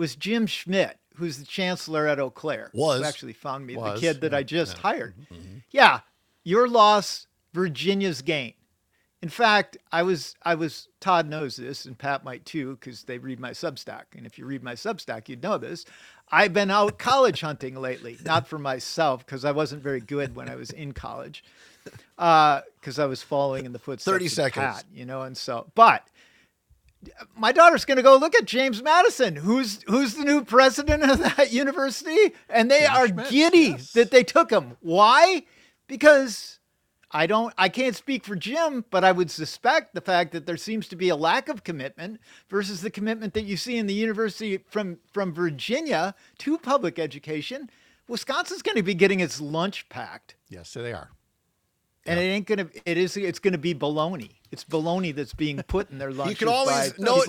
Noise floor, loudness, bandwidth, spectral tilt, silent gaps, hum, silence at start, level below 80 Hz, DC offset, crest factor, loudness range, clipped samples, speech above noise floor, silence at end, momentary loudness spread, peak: -73 dBFS; -23 LUFS; 17 kHz; -4.5 dB/octave; none; none; 0 s; -52 dBFS; under 0.1%; 24 dB; 10 LU; under 0.1%; 50 dB; 0 s; 18 LU; 0 dBFS